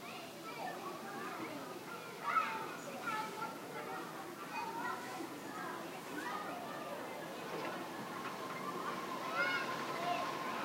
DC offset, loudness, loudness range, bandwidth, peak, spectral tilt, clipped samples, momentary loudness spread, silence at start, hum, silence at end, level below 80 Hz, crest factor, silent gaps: under 0.1%; -42 LUFS; 4 LU; 16 kHz; -22 dBFS; -3.5 dB/octave; under 0.1%; 9 LU; 0 s; none; 0 s; -84 dBFS; 20 dB; none